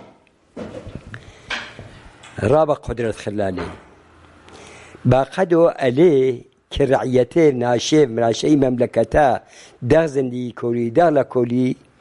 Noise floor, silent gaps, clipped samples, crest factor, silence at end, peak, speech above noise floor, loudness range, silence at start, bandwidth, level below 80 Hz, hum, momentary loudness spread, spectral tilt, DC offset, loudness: -52 dBFS; none; under 0.1%; 18 dB; 0.25 s; -2 dBFS; 35 dB; 7 LU; 0.55 s; 11.5 kHz; -42 dBFS; none; 18 LU; -6.5 dB/octave; under 0.1%; -18 LUFS